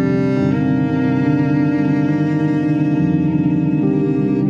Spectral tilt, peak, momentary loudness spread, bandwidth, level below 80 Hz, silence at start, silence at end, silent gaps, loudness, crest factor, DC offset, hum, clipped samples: -9.5 dB/octave; -4 dBFS; 1 LU; 7 kHz; -48 dBFS; 0 s; 0 s; none; -16 LUFS; 12 dB; under 0.1%; none; under 0.1%